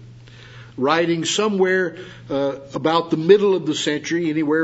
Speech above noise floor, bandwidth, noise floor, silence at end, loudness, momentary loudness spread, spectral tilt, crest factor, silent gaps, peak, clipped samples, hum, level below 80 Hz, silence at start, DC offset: 23 dB; 8 kHz; -42 dBFS; 0 s; -19 LUFS; 10 LU; -4.5 dB/octave; 20 dB; none; 0 dBFS; under 0.1%; none; -60 dBFS; 0 s; under 0.1%